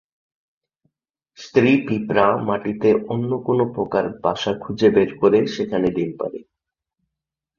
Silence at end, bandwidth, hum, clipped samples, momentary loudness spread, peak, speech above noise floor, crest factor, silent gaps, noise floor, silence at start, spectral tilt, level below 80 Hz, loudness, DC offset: 1.15 s; 7 kHz; none; under 0.1%; 8 LU; -2 dBFS; 66 dB; 20 dB; none; -85 dBFS; 1.4 s; -7 dB/octave; -56 dBFS; -20 LUFS; under 0.1%